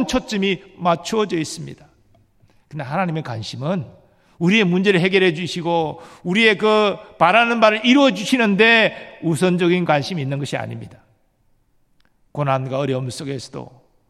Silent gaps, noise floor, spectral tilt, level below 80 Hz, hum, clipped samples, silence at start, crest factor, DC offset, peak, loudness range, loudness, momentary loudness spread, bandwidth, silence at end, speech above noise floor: none; -61 dBFS; -5.5 dB/octave; -54 dBFS; none; under 0.1%; 0 s; 18 dB; under 0.1%; 0 dBFS; 11 LU; -18 LUFS; 16 LU; 13 kHz; 0.45 s; 42 dB